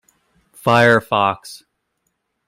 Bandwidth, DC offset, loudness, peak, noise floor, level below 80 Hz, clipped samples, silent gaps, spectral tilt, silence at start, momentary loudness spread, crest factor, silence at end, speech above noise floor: 16 kHz; under 0.1%; -15 LUFS; 0 dBFS; -72 dBFS; -60 dBFS; under 0.1%; none; -5.5 dB/octave; 0.65 s; 17 LU; 18 dB; 0.9 s; 56 dB